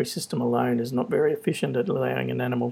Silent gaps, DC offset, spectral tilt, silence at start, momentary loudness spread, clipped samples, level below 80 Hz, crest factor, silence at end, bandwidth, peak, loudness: none; under 0.1%; -6 dB/octave; 0 s; 3 LU; under 0.1%; -70 dBFS; 16 dB; 0 s; 16.5 kHz; -10 dBFS; -25 LUFS